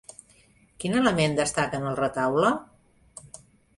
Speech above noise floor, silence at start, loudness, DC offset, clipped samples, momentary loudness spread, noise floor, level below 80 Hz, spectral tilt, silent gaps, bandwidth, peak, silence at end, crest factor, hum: 35 dB; 0.8 s; -25 LUFS; under 0.1%; under 0.1%; 22 LU; -59 dBFS; -56 dBFS; -5 dB/octave; none; 11.5 kHz; -8 dBFS; 0.4 s; 20 dB; none